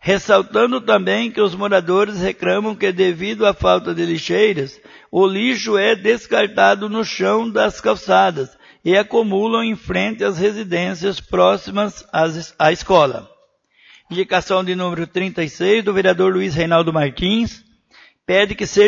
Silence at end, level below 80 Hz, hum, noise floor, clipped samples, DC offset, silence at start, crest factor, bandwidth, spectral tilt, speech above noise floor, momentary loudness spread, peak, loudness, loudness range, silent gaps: 0 s; -46 dBFS; none; -57 dBFS; under 0.1%; under 0.1%; 0 s; 16 dB; 7.6 kHz; -5 dB/octave; 40 dB; 7 LU; 0 dBFS; -17 LUFS; 2 LU; none